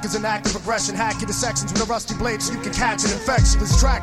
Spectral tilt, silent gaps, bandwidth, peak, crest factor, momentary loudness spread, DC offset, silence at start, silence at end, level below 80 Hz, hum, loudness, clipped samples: -3.5 dB/octave; none; 13.5 kHz; -4 dBFS; 16 dB; 6 LU; under 0.1%; 0 s; 0 s; -26 dBFS; none; -21 LUFS; under 0.1%